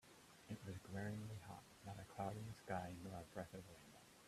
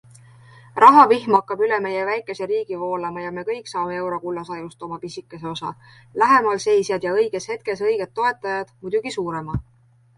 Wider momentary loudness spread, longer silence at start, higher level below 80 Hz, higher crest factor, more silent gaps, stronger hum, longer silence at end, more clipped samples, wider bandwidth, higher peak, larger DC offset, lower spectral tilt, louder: second, 13 LU vs 18 LU; second, 0.05 s vs 0.75 s; second, -74 dBFS vs -52 dBFS; about the same, 22 dB vs 20 dB; neither; neither; second, 0 s vs 0.55 s; neither; first, 15 kHz vs 11.5 kHz; second, -30 dBFS vs 0 dBFS; neither; about the same, -6 dB/octave vs -5 dB/octave; second, -52 LUFS vs -20 LUFS